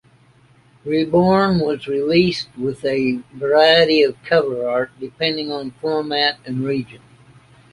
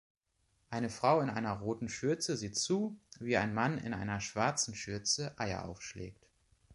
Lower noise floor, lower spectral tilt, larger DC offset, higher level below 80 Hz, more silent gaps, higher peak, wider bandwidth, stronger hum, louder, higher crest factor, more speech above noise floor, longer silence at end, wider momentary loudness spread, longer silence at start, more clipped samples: second, -52 dBFS vs -77 dBFS; first, -6.5 dB/octave vs -4 dB/octave; neither; first, -52 dBFS vs -62 dBFS; neither; first, -2 dBFS vs -14 dBFS; about the same, 11.5 kHz vs 11.5 kHz; neither; first, -18 LUFS vs -35 LUFS; second, 16 dB vs 22 dB; second, 34 dB vs 42 dB; first, 0.75 s vs 0 s; about the same, 12 LU vs 13 LU; first, 0.85 s vs 0.7 s; neither